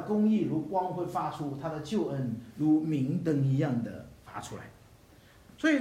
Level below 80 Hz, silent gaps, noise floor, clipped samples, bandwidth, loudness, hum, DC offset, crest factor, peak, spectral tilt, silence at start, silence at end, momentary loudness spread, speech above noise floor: -64 dBFS; none; -57 dBFS; under 0.1%; 13.5 kHz; -30 LUFS; none; under 0.1%; 16 dB; -16 dBFS; -7.5 dB/octave; 0 s; 0 s; 16 LU; 27 dB